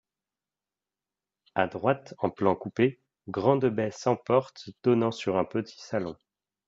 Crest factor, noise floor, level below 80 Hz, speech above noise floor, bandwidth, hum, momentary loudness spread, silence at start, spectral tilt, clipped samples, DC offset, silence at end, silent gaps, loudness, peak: 22 dB; under -90 dBFS; -70 dBFS; over 63 dB; 7.8 kHz; 50 Hz at -60 dBFS; 9 LU; 1.55 s; -7 dB/octave; under 0.1%; under 0.1%; 0.55 s; none; -28 LUFS; -8 dBFS